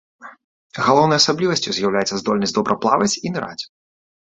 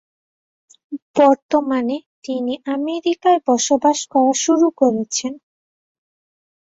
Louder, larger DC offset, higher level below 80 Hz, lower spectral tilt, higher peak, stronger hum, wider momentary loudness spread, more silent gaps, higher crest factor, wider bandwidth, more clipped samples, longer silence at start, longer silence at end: about the same, -18 LUFS vs -18 LUFS; neither; first, -58 dBFS vs -64 dBFS; about the same, -4 dB/octave vs -3 dB/octave; about the same, 0 dBFS vs -2 dBFS; neither; first, 14 LU vs 11 LU; second, 0.44-0.70 s vs 1.02-1.14 s, 1.42-1.49 s, 2.06-2.22 s; about the same, 20 dB vs 18 dB; about the same, 8.4 kHz vs 8 kHz; neither; second, 0.2 s vs 0.9 s; second, 0.65 s vs 1.3 s